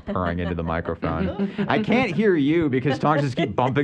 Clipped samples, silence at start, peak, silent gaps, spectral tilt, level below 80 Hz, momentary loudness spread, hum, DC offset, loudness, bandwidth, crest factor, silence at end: under 0.1%; 0.05 s; -6 dBFS; none; -7.5 dB/octave; -44 dBFS; 7 LU; none; under 0.1%; -22 LUFS; 9 kHz; 16 dB; 0 s